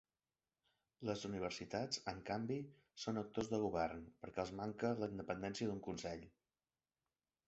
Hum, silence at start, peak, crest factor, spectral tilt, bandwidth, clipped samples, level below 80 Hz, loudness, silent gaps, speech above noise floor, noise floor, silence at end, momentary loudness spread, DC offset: none; 1 s; -26 dBFS; 20 dB; -5 dB/octave; 8 kHz; under 0.1%; -70 dBFS; -44 LUFS; none; over 46 dB; under -90 dBFS; 1.2 s; 8 LU; under 0.1%